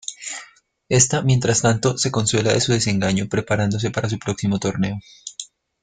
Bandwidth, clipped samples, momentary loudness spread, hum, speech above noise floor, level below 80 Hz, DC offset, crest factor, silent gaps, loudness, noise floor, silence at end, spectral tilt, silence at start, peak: 9.6 kHz; under 0.1%; 16 LU; none; 28 dB; -48 dBFS; under 0.1%; 18 dB; none; -20 LUFS; -47 dBFS; 0.35 s; -4.5 dB/octave; 0.1 s; -2 dBFS